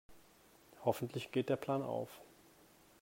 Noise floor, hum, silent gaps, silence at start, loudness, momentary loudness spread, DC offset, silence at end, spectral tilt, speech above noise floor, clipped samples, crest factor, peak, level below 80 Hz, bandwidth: -65 dBFS; none; none; 0.1 s; -39 LUFS; 9 LU; under 0.1%; 0.75 s; -6.5 dB/octave; 27 dB; under 0.1%; 24 dB; -18 dBFS; -76 dBFS; 16 kHz